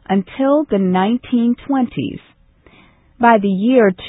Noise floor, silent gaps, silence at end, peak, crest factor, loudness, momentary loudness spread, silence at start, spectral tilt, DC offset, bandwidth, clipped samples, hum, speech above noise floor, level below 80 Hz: -49 dBFS; none; 0 s; 0 dBFS; 16 dB; -16 LUFS; 9 LU; 0.1 s; -12 dB/octave; under 0.1%; 4 kHz; under 0.1%; none; 35 dB; -50 dBFS